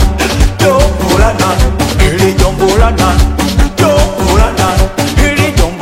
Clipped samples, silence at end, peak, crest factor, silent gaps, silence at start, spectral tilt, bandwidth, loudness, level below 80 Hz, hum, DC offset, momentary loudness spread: 0.8%; 0 s; 0 dBFS; 8 dB; none; 0 s; -5 dB/octave; 16.5 kHz; -10 LUFS; -12 dBFS; none; under 0.1%; 3 LU